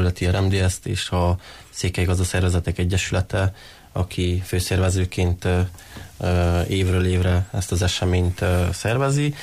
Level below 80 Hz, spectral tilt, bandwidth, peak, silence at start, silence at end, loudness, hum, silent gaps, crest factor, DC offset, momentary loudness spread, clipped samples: -36 dBFS; -5.5 dB/octave; 15 kHz; -10 dBFS; 0 s; 0 s; -22 LUFS; none; none; 10 dB; under 0.1%; 7 LU; under 0.1%